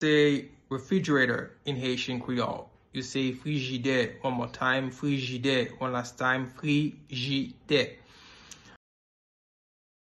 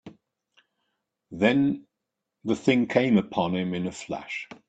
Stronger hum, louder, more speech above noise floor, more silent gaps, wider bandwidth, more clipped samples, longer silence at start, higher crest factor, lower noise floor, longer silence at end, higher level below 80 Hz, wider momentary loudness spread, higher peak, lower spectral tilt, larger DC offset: neither; second, -29 LUFS vs -25 LUFS; second, 23 dB vs 59 dB; neither; first, 11.5 kHz vs 8.8 kHz; neither; about the same, 0 s vs 0.05 s; about the same, 18 dB vs 22 dB; second, -51 dBFS vs -84 dBFS; first, 1.35 s vs 0.15 s; about the same, -64 dBFS vs -64 dBFS; second, 10 LU vs 13 LU; second, -12 dBFS vs -6 dBFS; about the same, -5.5 dB/octave vs -6.5 dB/octave; neither